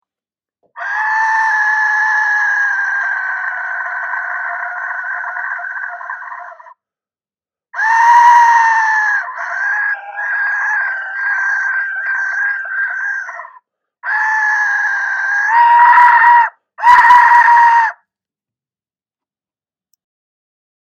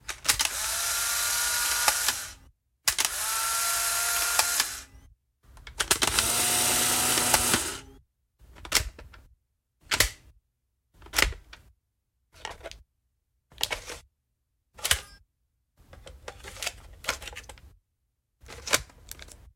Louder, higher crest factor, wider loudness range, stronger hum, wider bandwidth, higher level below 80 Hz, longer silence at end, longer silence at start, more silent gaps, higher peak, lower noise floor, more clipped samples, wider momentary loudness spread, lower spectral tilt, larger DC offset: first, -12 LUFS vs -25 LUFS; second, 14 dB vs 28 dB; about the same, 12 LU vs 10 LU; neither; second, 9 kHz vs 16.5 kHz; second, -64 dBFS vs -48 dBFS; first, 2.95 s vs 0.2 s; first, 0.75 s vs 0.05 s; neither; about the same, 0 dBFS vs -2 dBFS; first, under -90 dBFS vs -78 dBFS; neither; second, 15 LU vs 21 LU; second, 1.5 dB/octave vs 0 dB/octave; neither